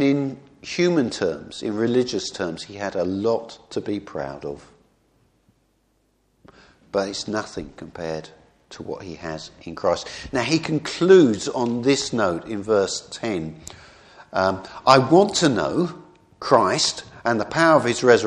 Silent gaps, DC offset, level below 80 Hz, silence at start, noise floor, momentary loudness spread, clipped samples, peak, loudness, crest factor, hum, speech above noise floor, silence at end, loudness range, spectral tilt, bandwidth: none; under 0.1%; -56 dBFS; 0 s; -66 dBFS; 17 LU; under 0.1%; 0 dBFS; -21 LUFS; 22 dB; none; 44 dB; 0 s; 13 LU; -4.5 dB/octave; 11 kHz